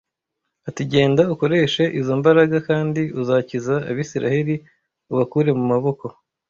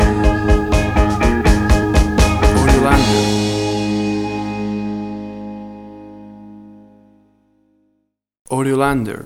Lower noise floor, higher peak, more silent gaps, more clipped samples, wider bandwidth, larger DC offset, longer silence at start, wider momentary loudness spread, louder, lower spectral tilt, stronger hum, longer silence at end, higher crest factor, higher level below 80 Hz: first, -79 dBFS vs -68 dBFS; about the same, -2 dBFS vs 0 dBFS; second, none vs 8.41-8.45 s; neither; second, 7.4 kHz vs 15 kHz; neither; first, 0.65 s vs 0 s; second, 11 LU vs 19 LU; second, -19 LUFS vs -16 LUFS; about the same, -7 dB/octave vs -6 dB/octave; neither; first, 0.4 s vs 0 s; about the same, 18 dB vs 16 dB; second, -56 dBFS vs -22 dBFS